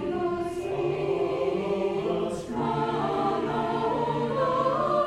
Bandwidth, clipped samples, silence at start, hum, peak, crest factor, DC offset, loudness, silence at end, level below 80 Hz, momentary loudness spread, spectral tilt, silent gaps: 12 kHz; under 0.1%; 0 s; none; -12 dBFS; 14 dB; under 0.1%; -27 LUFS; 0 s; -54 dBFS; 5 LU; -7 dB/octave; none